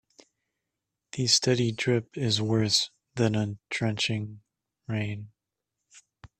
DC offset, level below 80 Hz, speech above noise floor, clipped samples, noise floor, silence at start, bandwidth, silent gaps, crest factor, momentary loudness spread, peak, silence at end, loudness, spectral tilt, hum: under 0.1%; -62 dBFS; 58 dB; under 0.1%; -85 dBFS; 1.15 s; 13.5 kHz; none; 24 dB; 13 LU; -6 dBFS; 0.15 s; -27 LUFS; -4 dB/octave; none